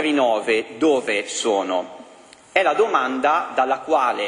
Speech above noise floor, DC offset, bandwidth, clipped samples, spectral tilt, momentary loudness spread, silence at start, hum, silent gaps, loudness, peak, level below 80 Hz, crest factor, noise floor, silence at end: 27 dB; under 0.1%; 10.5 kHz; under 0.1%; -2.5 dB/octave; 5 LU; 0 s; none; none; -20 LUFS; -2 dBFS; -68 dBFS; 18 dB; -47 dBFS; 0 s